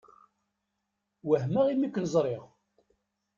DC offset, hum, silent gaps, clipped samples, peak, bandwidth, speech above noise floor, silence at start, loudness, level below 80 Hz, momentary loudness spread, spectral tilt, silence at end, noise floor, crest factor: under 0.1%; none; none; under 0.1%; -12 dBFS; 7.6 kHz; 55 dB; 1.25 s; -28 LUFS; -70 dBFS; 12 LU; -7.5 dB/octave; 0.9 s; -83 dBFS; 18 dB